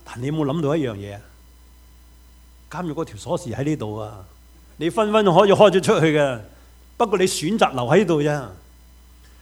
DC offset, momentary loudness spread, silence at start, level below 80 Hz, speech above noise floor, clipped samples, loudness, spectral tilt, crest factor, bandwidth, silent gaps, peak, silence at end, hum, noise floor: under 0.1%; 19 LU; 0.05 s; -48 dBFS; 29 dB; under 0.1%; -20 LUFS; -5.5 dB/octave; 22 dB; over 20 kHz; none; 0 dBFS; 0.85 s; none; -48 dBFS